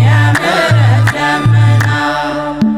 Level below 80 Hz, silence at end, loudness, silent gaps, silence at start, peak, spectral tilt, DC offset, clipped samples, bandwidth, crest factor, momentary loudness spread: -40 dBFS; 0 s; -11 LUFS; none; 0 s; 0 dBFS; -6 dB/octave; under 0.1%; under 0.1%; 12 kHz; 10 dB; 6 LU